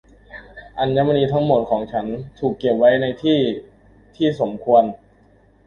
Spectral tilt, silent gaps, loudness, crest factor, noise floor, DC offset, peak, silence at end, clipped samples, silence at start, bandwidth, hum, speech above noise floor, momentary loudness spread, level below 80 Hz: -8.5 dB/octave; none; -19 LUFS; 18 dB; -53 dBFS; under 0.1%; -2 dBFS; 0.7 s; under 0.1%; 0.3 s; 6.8 kHz; none; 35 dB; 15 LU; -50 dBFS